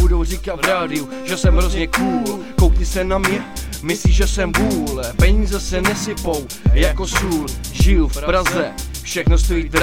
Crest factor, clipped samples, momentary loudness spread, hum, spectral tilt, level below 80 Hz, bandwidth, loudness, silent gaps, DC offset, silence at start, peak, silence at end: 16 dB; under 0.1%; 7 LU; none; -5 dB/octave; -20 dBFS; 16.5 kHz; -18 LUFS; none; under 0.1%; 0 s; 0 dBFS; 0 s